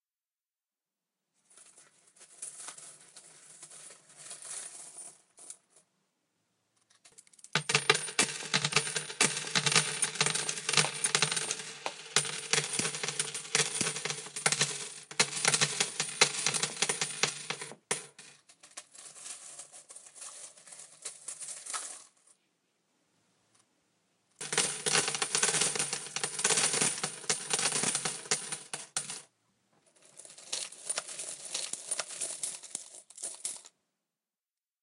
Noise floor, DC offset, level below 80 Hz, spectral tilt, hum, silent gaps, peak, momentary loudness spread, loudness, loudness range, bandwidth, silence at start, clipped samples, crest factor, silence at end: under -90 dBFS; under 0.1%; -82 dBFS; -0.5 dB/octave; none; none; -4 dBFS; 22 LU; -30 LUFS; 18 LU; 16 kHz; 1.55 s; under 0.1%; 32 dB; 1.15 s